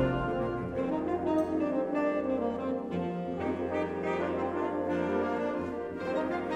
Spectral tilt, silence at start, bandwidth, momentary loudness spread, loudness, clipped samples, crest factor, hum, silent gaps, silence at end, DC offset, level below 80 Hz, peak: -8 dB/octave; 0 s; 9.2 kHz; 4 LU; -32 LUFS; under 0.1%; 16 dB; none; none; 0 s; under 0.1%; -54 dBFS; -16 dBFS